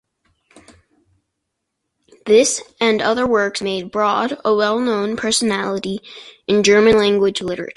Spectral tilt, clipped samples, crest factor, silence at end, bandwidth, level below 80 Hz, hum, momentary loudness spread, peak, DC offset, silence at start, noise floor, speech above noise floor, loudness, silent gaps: -3.5 dB/octave; under 0.1%; 16 dB; 0.05 s; 11.5 kHz; -52 dBFS; none; 11 LU; -2 dBFS; under 0.1%; 2.25 s; -76 dBFS; 60 dB; -17 LUFS; none